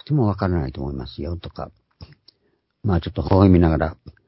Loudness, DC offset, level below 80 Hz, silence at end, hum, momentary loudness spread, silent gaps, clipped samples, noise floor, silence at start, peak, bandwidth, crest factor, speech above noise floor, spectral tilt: -21 LUFS; under 0.1%; -32 dBFS; 0.15 s; none; 17 LU; none; under 0.1%; -68 dBFS; 0.1 s; -2 dBFS; 5.8 kHz; 18 dB; 48 dB; -13 dB/octave